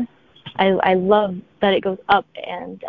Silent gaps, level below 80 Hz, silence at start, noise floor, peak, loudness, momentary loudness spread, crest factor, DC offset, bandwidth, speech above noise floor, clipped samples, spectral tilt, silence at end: none; -54 dBFS; 0 s; -42 dBFS; -2 dBFS; -18 LUFS; 15 LU; 18 dB; under 0.1%; 5.4 kHz; 24 dB; under 0.1%; -8.5 dB/octave; 0 s